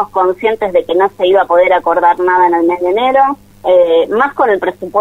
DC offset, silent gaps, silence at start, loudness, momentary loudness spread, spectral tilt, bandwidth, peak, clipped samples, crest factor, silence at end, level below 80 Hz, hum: under 0.1%; none; 0 s; -11 LUFS; 5 LU; -6 dB/octave; 7.4 kHz; 0 dBFS; under 0.1%; 10 dB; 0 s; -48 dBFS; none